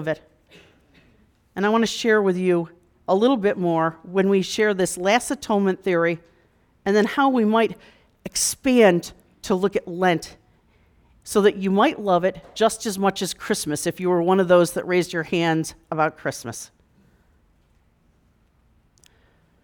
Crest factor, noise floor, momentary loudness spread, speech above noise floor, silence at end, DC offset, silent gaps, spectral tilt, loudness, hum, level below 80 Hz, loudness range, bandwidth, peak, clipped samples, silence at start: 18 dB; -61 dBFS; 12 LU; 40 dB; 3 s; under 0.1%; none; -4.5 dB/octave; -21 LUFS; none; -58 dBFS; 5 LU; 19.5 kHz; -4 dBFS; under 0.1%; 0 s